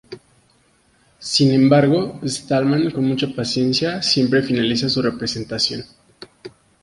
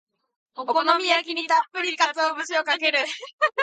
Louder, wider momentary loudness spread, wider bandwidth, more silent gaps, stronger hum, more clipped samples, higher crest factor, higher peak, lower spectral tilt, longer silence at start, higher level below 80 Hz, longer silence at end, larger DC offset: first, -18 LUFS vs -22 LUFS; first, 11 LU vs 7 LU; first, 11.5 kHz vs 9.4 kHz; second, none vs 3.33-3.38 s; neither; neither; about the same, 18 dB vs 20 dB; about the same, -2 dBFS vs -4 dBFS; first, -5 dB/octave vs 0.5 dB/octave; second, 0.1 s vs 0.55 s; first, -54 dBFS vs -90 dBFS; first, 0.35 s vs 0 s; neither